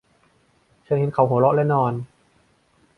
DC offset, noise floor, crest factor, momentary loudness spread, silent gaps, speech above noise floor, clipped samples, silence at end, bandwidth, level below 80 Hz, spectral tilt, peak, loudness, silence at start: under 0.1%; -61 dBFS; 18 dB; 12 LU; none; 42 dB; under 0.1%; 0.95 s; 4.6 kHz; -60 dBFS; -10.5 dB/octave; -4 dBFS; -20 LUFS; 0.9 s